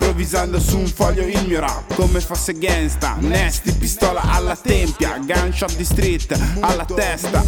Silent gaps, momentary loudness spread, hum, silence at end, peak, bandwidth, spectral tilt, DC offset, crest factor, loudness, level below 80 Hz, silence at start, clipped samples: none; 3 LU; none; 0 s; -2 dBFS; 19 kHz; -4.5 dB/octave; under 0.1%; 16 dB; -19 LUFS; -22 dBFS; 0 s; under 0.1%